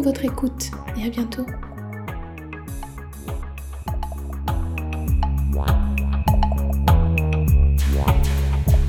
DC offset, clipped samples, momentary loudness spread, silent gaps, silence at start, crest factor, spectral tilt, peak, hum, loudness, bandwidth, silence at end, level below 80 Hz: under 0.1%; under 0.1%; 15 LU; none; 0 s; 16 dB; -6.5 dB/octave; -4 dBFS; none; -22 LUFS; 17.5 kHz; 0 s; -22 dBFS